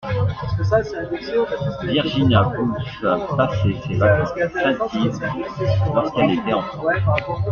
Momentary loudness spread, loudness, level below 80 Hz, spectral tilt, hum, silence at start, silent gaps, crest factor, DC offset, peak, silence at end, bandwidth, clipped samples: 7 LU; -20 LUFS; -42 dBFS; -7.5 dB/octave; none; 0 s; none; 16 dB; under 0.1%; -2 dBFS; 0 s; 6.8 kHz; under 0.1%